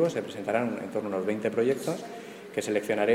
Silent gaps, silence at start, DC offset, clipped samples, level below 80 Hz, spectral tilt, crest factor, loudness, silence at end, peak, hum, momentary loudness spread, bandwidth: none; 0 s; under 0.1%; under 0.1%; -72 dBFS; -5.5 dB/octave; 18 dB; -30 LUFS; 0 s; -12 dBFS; none; 9 LU; 16.5 kHz